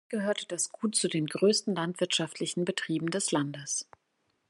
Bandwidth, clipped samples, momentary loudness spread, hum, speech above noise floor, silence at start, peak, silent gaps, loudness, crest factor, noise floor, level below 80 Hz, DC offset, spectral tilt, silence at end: 12.5 kHz; under 0.1%; 7 LU; none; 46 dB; 0.1 s; -14 dBFS; none; -30 LUFS; 18 dB; -76 dBFS; -80 dBFS; under 0.1%; -3.5 dB/octave; 0.65 s